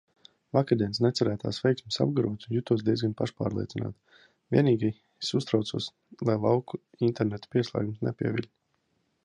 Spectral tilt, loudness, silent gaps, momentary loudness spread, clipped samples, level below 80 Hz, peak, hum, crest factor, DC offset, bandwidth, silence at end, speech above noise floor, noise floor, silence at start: -7 dB/octave; -29 LUFS; none; 9 LU; under 0.1%; -60 dBFS; -8 dBFS; none; 20 dB; under 0.1%; 10.5 kHz; 0.8 s; 47 dB; -74 dBFS; 0.55 s